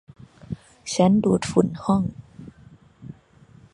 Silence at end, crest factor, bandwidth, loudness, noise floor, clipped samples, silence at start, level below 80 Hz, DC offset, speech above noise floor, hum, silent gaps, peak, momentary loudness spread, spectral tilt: 0.6 s; 22 dB; 11.5 kHz; -21 LUFS; -52 dBFS; under 0.1%; 0.5 s; -52 dBFS; under 0.1%; 32 dB; none; none; -2 dBFS; 25 LU; -6.5 dB/octave